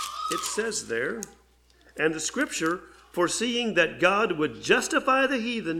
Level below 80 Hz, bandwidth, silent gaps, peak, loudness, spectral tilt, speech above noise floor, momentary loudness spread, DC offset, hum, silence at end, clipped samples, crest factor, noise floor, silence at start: -60 dBFS; 17.5 kHz; none; -6 dBFS; -25 LUFS; -2.5 dB/octave; 33 dB; 10 LU; under 0.1%; none; 0 s; under 0.1%; 20 dB; -59 dBFS; 0 s